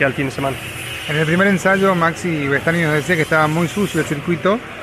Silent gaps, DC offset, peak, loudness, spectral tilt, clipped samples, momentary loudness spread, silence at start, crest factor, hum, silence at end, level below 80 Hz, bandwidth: none; under 0.1%; -2 dBFS; -17 LUFS; -5.5 dB/octave; under 0.1%; 8 LU; 0 s; 16 dB; none; 0 s; -46 dBFS; 14.5 kHz